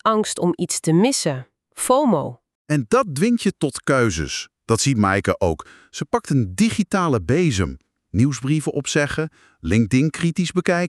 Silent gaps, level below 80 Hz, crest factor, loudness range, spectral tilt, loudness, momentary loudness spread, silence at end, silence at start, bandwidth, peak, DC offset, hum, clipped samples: 2.55-2.65 s; -44 dBFS; 16 dB; 1 LU; -5 dB/octave; -20 LUFS; 10 LU; 0 s; 0.05 s; 13.5 kHz; -4 dBFS; under 0.1%; none; under 0.1%